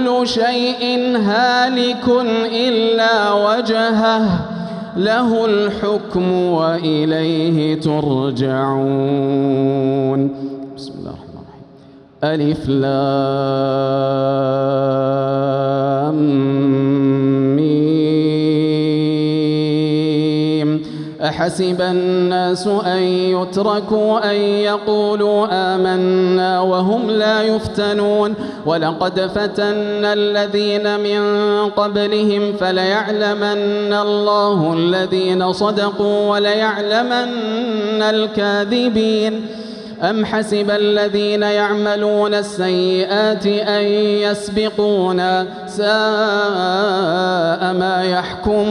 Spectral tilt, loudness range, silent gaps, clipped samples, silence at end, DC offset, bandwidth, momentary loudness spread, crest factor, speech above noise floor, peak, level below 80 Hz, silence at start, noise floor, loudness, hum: -6.5 dB/octave; 2 LU; none; under 0.1%; 0 s; under 0.1%; 11 kHz; 4 LU; 12 dB; 27 dB; -4 dBFS; -50 dBFS; 0 s; -42 dBFS; -16 LUFS; none